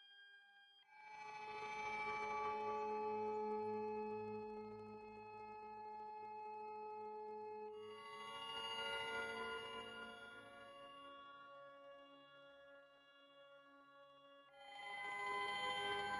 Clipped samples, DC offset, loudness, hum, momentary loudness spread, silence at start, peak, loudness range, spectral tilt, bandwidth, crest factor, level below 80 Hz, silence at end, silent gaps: under 0.1%; under 0.1%; -48 LUFS; none; 21 LU; 0 s; -32 dBFS; 15 LU; -3 dB/octave; 11 kHz; 18 dB; -82 dBFS; 0 s; none